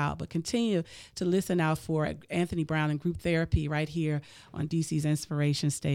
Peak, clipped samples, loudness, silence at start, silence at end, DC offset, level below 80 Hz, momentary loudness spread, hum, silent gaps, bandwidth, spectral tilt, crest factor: -12 dBFS; under 0.1%; -30 LUFS; 0 s; 0 s; under 0.1%; -48 dBFS; 5 LU; none; none; 16 kHz; -6 dB/octave; 18 dB